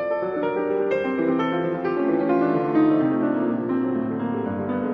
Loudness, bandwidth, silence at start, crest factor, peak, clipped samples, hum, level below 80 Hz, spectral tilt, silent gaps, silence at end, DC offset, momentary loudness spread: -23 LUFS; 5.2 kHz; 0 s; 12 dB; -10 dBFS; under 0.1%; none; -64 dBFS; -9.5 dB/octave; none; 0 s; under 0.1%; 6 LU